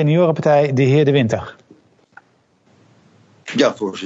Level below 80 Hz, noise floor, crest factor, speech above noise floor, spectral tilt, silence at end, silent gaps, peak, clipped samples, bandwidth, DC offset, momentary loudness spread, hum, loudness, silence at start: -58 dBFS; -58 dBFS; 16 dB; 43 dB; -7 dB/octave; 0 s; none; -2 dBFS; under 0.1%; 8 kHz; under 0.1%; 11 LU; none; -16 LUFS; 0 s